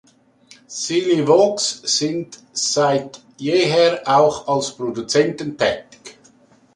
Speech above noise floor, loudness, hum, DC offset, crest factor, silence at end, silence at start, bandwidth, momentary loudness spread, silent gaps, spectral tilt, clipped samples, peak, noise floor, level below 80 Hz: 34 dB; -18 LUFS; none; under 0.1%; 16 dB; 0.65 s; 0.7 s; 11.5 kHz; 13 LU; none; -3.5 dB/octave; under 0.1%; -2 dBFS; -52 dBFS; -60 dBFS